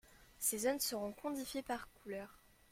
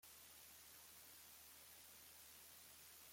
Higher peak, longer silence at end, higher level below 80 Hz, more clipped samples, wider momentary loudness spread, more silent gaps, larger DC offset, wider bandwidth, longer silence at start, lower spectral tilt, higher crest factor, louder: first, -22 dBFS vs -50 dBFS; first, 0.35 s vs 0 s; first, -70 dBFS vs -86 dBFS; neither; first, 12 LU vs 0 LU; neither; neither; about the same, 16.5 kHz vs 16.5 kHz; about the same, 0.1 s vs 0 s; first, -2 dB/octave vs 0 dB/octave; first, 20 dB vs 14 dB; first, -40 LUFS vs -60 LUFS